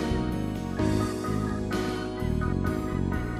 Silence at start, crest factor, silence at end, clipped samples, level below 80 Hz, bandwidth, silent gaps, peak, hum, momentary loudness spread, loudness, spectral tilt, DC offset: 0 s; 14 dB; 0 s; under 0.1%; -38 dBFS; 15 kHz; none; -12 dBFS; none; 4 LU; -29 LUFS; -7 dB/octave; under 0.1%